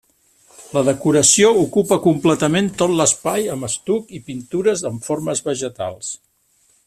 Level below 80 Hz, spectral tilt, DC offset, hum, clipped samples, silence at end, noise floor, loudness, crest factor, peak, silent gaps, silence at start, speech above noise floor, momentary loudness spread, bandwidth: -54 dBFS; -4 dB/octave; under 0.1%; none; under 0.1%; 0.7 s; -60 dBFS; -17 LUFS; 18 dB; 0 dBFS; none; 0.6 s; 42 dB; 14 LU; 14.5 kHz